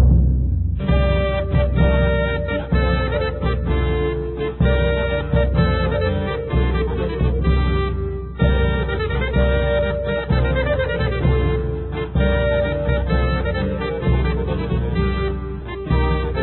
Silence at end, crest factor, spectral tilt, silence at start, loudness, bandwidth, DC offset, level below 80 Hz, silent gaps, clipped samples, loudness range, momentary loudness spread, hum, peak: 0 s; 14 dB; -12.5 dB/octave; 0 s; -20 LUFS; 4.2 kHz; under 0.1%; -22 dBFS; none; under 0.1%; 1 LU; 5 LU; none; -4 dBFS